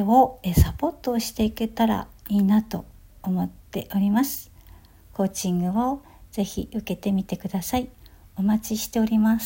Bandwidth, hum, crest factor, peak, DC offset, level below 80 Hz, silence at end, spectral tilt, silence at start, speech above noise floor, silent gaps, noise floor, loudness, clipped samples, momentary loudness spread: 17 kHz; none; 20 dB; -4 dBFS; under 0.1%; -40 dBFS; 0 s; -6 dB/octave; 0 s; 26 dB; none; -49 dBFS; -25 LUFS; under 0.1%; 13 LU